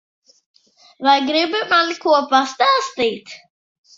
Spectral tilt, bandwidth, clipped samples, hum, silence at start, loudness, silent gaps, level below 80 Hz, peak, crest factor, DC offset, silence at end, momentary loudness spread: -2 dB/octave; 7.8 kHz; under 0.1%; none; 1 s; -17 LUFS; none; -68 dBFS; 0 dBFS; 18 dB; under 0.1%; 0.6 s; 7 LU